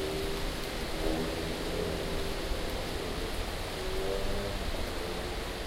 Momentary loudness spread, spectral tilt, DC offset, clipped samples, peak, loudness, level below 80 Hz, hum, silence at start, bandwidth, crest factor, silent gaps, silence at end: 3 LU; -4.5 dB/octave; under 0.1%; under 0.1%; -16 dBFS; -35 LUFS; -38 dBFS; none; 0 s; 16 kHz; 18 dB; none; 0 s